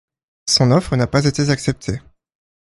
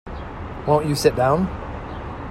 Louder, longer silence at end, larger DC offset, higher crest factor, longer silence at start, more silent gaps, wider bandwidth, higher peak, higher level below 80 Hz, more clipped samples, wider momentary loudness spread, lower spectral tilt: first, -17 LUFS vs -20 LUFS; first, 0.7 s vs 0 s; neither; about the same, 18 dB vs 20 dB; first, 0.45 s vs 0.05 s; neither; second, 11.5 kHz vs 14.5 kHz; about the same, 0 dBFS vs -2 dBFS; about the same, -42 dBFS vs -38 dBFS; neither; about the same, 14 LU vs 15 LU; about the same, -5 dB/octave vs -6 dB/octave